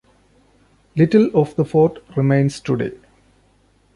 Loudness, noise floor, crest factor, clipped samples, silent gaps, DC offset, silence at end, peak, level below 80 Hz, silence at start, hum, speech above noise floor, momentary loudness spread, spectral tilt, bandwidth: -18 LUFS; -57 dBFS; 18 dB; under 0.1%; none; under 0.1%; 1 s; -2 dBFS; -54 dBFS; 0.95 s; 50 Hz at -40 dBFS; 41 dB; 8 LU; -8.5 dB/octave; 11.5 kHz